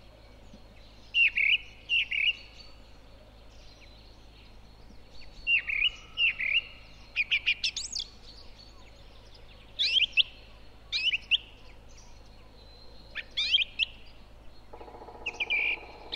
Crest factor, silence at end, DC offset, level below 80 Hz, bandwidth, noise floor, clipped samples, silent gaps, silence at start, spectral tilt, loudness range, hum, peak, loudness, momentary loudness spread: 22 dB; 0 s; under 0.1%; -52 dBFS; 13.5 kHz; -51 dBFS; under 0.1%; none; 0.5 s; 0 dB/octave; 5 LU; none; -10 dBFS; -27 LUFS; 21 LU